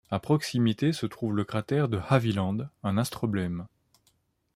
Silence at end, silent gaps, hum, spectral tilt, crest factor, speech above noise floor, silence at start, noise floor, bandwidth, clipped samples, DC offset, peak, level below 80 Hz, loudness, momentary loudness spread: 0.9 s; none; none; -6.5 dB/octave; 20 dB; 43 dB; 0.1 s; -70 dBFS; 15.5 kHz; under 0.1%; under 0.1%; -8 dBFS; -62 dBFS; -28 LUFS; 7 LU